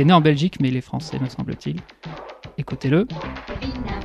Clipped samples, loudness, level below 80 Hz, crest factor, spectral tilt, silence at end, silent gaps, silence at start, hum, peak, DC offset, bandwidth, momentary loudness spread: under 0.1%; -23 LUFS; -42 dBFS; 20 dB; -7.5 dB/octave; 0 s; none; 0 s; none; -2 dBFS; under 0.1%; 9.8 kHz; 17 LU